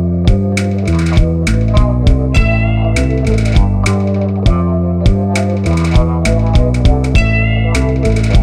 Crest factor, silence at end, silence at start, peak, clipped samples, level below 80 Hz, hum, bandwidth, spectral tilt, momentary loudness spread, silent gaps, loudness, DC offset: 10 dB; 0 s; 0 s; 0 dBFS; under 0.1%; -16 dBFS; none; 11.5 kHz; -7 dB/octave; 2 LU; none; -13 LUFS; under 0.1%